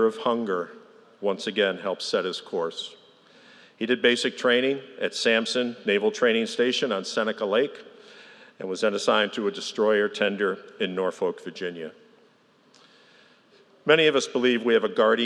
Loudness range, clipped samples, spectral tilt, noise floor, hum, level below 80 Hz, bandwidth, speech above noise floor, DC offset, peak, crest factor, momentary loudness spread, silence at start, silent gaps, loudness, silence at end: 6 LU; under 0.1%; -3.5 dB/octave; -60 dBFS; none; -88 dBFS; 11 kHz; 36 dB; under 0.1%; -4 dBFS; 22 dB; 12 LU; 0 s; none; -25 LUFS; 0 s